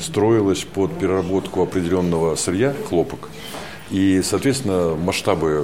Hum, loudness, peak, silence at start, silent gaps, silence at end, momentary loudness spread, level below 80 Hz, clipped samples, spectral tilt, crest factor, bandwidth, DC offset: none; -20 LUFS; -2 dBFS; 0 s; none; 0 s; 9 LU; -46 dBFS; under 0.1%; -5.5 dB/octave; 16 dB; 16.5 kHz; 0.7%